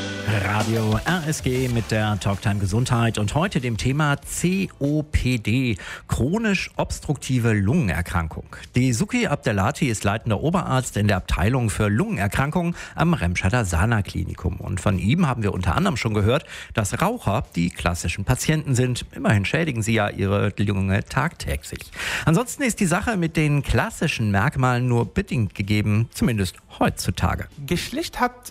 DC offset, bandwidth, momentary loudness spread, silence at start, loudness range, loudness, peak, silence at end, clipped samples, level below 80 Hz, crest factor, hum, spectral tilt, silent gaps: under 0.1%; 16 kHz; 6 LU; 0 s; 1 LU; -22 LUFS; -4 dBFS; 0 s; under 0.1%; -38 dBFS; 18 dB; none; -5.5 dB/octave; none